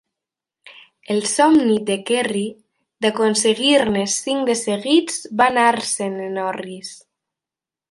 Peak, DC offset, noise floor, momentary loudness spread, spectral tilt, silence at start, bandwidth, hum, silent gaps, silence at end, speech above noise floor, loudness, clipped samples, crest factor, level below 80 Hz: -2 dBFS; under 0.1%; -89 dBFS; 11 LU; -3 dB/octave; 0.65 s; 11.5 kHz; none; none; 0.95 s; 71 dB; -18 LUFS; under 0.1%; 18 dB; -62 dBFS